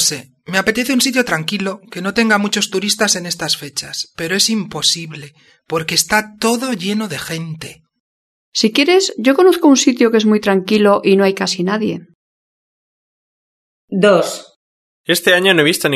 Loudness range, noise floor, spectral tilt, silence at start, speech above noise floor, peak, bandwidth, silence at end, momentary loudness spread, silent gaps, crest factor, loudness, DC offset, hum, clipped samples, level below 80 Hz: 7 LU; under -90 dBFS; -3 dB/octave; 0 s; over 75 dB; 0 dBFS; 13.5 kHz; 0 s; 13 LU; 8.00-8.52 s, 12.15-13.88 s, 14.56-15.04 s; 16 dB; -15 LUFS; under 0.1%; none; under 0.1%; -56 dBFS